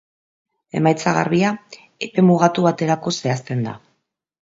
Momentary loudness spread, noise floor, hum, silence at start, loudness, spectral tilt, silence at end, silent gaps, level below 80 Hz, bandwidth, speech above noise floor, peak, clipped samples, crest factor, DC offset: 14 LU; -71 dBFS; none; 0.75 s; -19 LUFS; -6 dB/octave; 0.75 s; none; -62 dBFS; 7.8 kHz; 53 dB; 0 dBFS; under 0.1%; 20 dB; under 0.1%